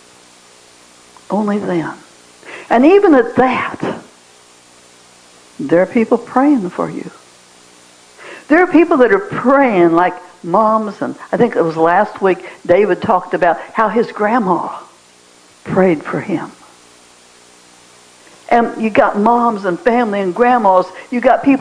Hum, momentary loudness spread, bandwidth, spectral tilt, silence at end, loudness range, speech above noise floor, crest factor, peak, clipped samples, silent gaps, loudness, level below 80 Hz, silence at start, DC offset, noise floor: 60 Hz at -45 dBFS; 14 LU; 11 kHz; -7 dB/octave; 0 s; 6 LU; 33 dB; 14 dB; 0 dBFS; under 0.1%; none; -14 LUFS; -52 dBFS; 1.3 s; under 0.1%; -46 dBFS